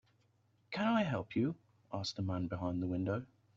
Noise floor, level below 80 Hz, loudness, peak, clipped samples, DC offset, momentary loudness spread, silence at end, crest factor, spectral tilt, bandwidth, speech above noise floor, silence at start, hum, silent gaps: -73 dBFS; -68 dBFS; -37 LUFS; -20 dBFS; under 0.1%; under 0.1%; 10 LU; 0.3 s; 18 dB; -5.5 dB/octave; 7.6 kHz; 37 dB; 0.7 s; none; none